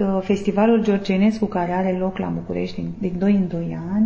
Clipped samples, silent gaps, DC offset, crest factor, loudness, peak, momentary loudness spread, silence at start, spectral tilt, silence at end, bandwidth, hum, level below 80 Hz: under 0.1%; none; under 0.1%; 14 dB; -21 LUFS; -6 dBFS; 9 LU; 0 s; -8 dB/octave; 0 s; 8 kHz; none; -46 dBFS